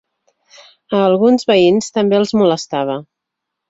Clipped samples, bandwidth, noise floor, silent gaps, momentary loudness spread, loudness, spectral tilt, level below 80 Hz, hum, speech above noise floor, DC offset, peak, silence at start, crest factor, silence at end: under 0.1%; 8 kHz; -79 dBFS; none; 9 LU; -14 LUFS; -5.5 dB/octave; -58 dBFS; none; 66 dB; under 0.1%; -2 dBFS; 0.9 s; 14 dB; 0.65 s